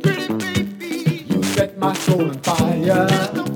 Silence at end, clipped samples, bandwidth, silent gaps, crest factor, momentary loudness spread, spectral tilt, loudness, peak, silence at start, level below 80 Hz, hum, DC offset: 0 s; under 0.1%; 19 kHz; none; 16 dB; 6 LU; -5.5 dB/octave; -19 LUFS; -2 dBFS; 0 s; -50 dBFS; none; under 0.1%